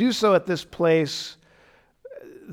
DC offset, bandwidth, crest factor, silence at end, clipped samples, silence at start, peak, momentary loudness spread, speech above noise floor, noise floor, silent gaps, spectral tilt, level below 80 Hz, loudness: under 0.1%; 16.5 kHz; 16 dB; 0 s; under 0.1%; 0 s; -8 dBFS; 23 LU; 36 dB; -58 dBFS; none; -5 dB/octave; -62 dBFS; -22 LUFS